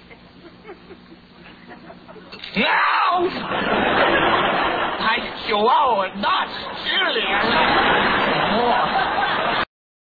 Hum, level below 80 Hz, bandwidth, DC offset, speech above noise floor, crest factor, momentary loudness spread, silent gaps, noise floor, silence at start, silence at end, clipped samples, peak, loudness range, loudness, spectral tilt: none; -48 dBFS; 4.9 kHz; under 0.1%; 26 dB; 16 dB; 7 LU; none; -45 dBFS; 0.1 s; 0.4 s; under 0.1%; -4 dBFS; 4 LU; -19 LUFS; -6.5 dB/octave